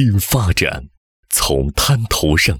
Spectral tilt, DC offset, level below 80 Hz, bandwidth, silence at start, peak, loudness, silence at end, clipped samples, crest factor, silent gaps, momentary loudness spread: -4 dB/octave; under 0.1%; -28 dBFS; 20 kHz; 0 s; -4 dBFS; -16 LUFS; 0 s; under 0.1%; 12 dB; 0.97-1.23 s; 4 LU